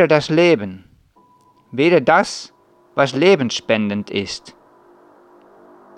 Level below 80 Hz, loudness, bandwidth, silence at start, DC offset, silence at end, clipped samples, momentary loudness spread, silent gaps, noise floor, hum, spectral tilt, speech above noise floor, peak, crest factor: -60 dBFS; -17 LUFS; 10.5 kHz; 0 s; under 0.1%; 1.45 s; under 0.1%; 17 LU; none; -54 dBFS; none; -5 dB/octave; 38 dB; -2 dBFS; 18 dB